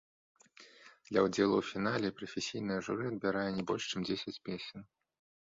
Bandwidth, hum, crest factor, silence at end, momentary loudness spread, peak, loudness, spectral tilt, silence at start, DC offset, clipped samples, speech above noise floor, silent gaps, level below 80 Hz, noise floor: 7.8 kHz; none; 20 dB; 0.6 s; 12 LU; -16 dBFS; -35 LUFS; -5 dB/octave; 0.6 s; under 0.1%; under 0.1%; 25 dB; none; -68 dBFS; -59 dBFS